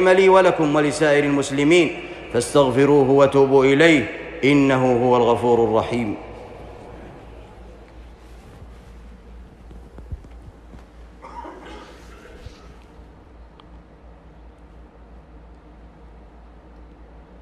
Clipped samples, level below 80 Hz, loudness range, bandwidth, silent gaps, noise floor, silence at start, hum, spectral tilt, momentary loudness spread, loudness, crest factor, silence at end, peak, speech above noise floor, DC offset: under 0.1%; -44 dBFS; 25 LU; 12 kHz; none; -45 dBFS; 0 s; none; -5.5 dB/octave; 25 LU; -17 LUFS; 18 dB; 3.65 s; -4 dBFS; 29 dB; under 0.1%